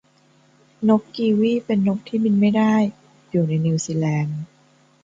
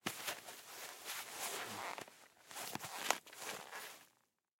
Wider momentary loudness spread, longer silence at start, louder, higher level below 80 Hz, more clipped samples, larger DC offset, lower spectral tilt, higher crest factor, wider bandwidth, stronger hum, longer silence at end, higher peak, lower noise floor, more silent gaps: second, 8 LU vs 13 LU; first, 0.8 s vs 0.05 s; first, -20 LUFS vs -45 LUFS; first, -64 dBFS vs -88 dBFS; neither; neither; first, -7 dB/octave vs -1 dB/octave; second, 16 dB vs 34 dB; second, 7.8 kHz vs 16.5 kHz; neither; about the same, 0.6 s vs 0.5 s; first, -4 dBFS vs -14 dBFS; second, -57 dBFS vs -77 dBFS; neither